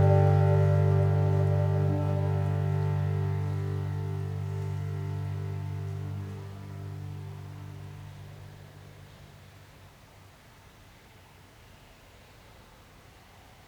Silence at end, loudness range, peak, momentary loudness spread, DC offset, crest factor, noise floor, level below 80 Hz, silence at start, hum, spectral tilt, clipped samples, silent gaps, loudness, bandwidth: 0.3 s; 25 LU; -12 dBFS; 24 LU; under 0.1%; 18 dB; -54 dBFS; -60 dBFS; 0 s; none; -9 dB/octave; under 0.1%; none; -29 LUFS; 7.2 kHz